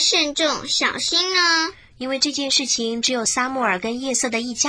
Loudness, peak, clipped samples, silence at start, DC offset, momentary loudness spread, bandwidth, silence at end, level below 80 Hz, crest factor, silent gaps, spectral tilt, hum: -19 LUFS; -4 dBFS; under 0.1%; 0 s; under 0.1%; 7 LU; 10.5 kHz; 0 s; -56 dBFS; 16 dB; none; -0.5 dB/octave; none